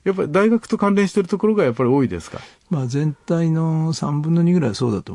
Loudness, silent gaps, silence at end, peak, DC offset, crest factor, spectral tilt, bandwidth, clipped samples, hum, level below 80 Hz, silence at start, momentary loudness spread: -19 LUFS; none; 0 s; -4 dBFS; under 0.1%; 14 dB; -7.5 dB/octave; 11 kHz; under 0.1%; none; -56 dBFS; 0.05 s; 7 LU